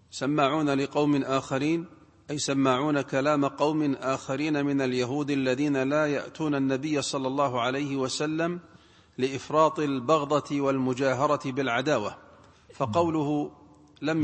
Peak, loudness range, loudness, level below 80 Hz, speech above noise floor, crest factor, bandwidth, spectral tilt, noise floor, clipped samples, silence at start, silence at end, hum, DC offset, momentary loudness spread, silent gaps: -8 dBFS; 2 LU; -27 LUFS; -64 dBFS; 27 dB; 18 dB; 8.8 kHz; -5.5 dB/octave; -53 dBFS; under 0.1%; 0.15 s; 0 s; none; under 0.1%; 7 LU; none